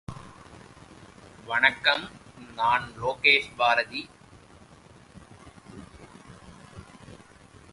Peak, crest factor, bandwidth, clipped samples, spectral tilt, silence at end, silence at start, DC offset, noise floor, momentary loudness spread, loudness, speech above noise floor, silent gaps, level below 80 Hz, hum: -4 dBFS; 26 dB; 11.5 kHz; under 0.1%; -3 dB/octave; 0.6 s; 0.1 s; under 0.1%; -52 dBFS; 27 LU; -24 LUFS; 27 dB; none; -58 dBFS; none